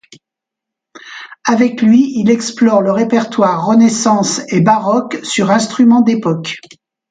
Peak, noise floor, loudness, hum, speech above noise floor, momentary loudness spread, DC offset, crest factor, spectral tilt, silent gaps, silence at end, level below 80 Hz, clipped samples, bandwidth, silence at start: 0 dBFS; -83 dBFS; -12 LUFS; none; 71 dB; 10 LU; under 0.1%; 12 dB; -5 dB/octave; none; 0.5 s; -60 dBFS; under 0.1%; 9.4 kHz; 0.95 s